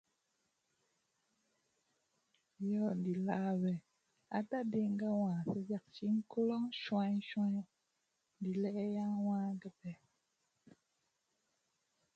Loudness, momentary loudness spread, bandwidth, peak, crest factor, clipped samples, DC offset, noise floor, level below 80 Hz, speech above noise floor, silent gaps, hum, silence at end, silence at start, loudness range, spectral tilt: -38 LUFS; 9 LU; 7.4 kHz; -22 dBFS; 18 dB; under 0.1%; under 0.1%; -84 dBFS; -84 dBFS; 47 dB; none; none; 2.2 s; 2.6 s; 5 LU; -8.5 dB/octave